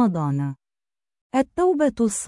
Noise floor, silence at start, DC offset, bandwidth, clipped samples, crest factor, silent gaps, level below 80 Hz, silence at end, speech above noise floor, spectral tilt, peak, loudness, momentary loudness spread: under -90 dBFS; 0 s; under 0.1%; 12 kHz; under 0.1%; 16 dB; 1.21-1.30 s; -56 dBFS; 0 s; over 69 dB; -6.5 dB/octave; -8 dBFS; -23 LUFS; 9 LU